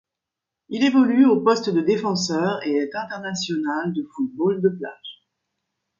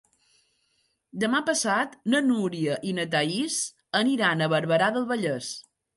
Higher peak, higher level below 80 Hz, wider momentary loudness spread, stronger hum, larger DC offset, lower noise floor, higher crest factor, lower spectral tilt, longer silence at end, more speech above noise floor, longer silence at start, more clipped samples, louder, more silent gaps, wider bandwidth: first, -4 dBFS vs -10 dBFS; first, -68 dBFS vs -74 dBFS; first, 14 LU vs 7 LU; neither; neither; first, -85 dBFS vs -72 dBFS; about the same, 18 dB vs 18 dB; first, -5.5 dB/octave vs -4 dB/octave; first, 0.85 s vs 0.35 s; first, 64 dB vs 46 dB; second, 0.7 s vs 1.15 s; neither; first, -21 LUFS vs -25 LUFS; neither; second, 7.6 kHz vs 12 kHz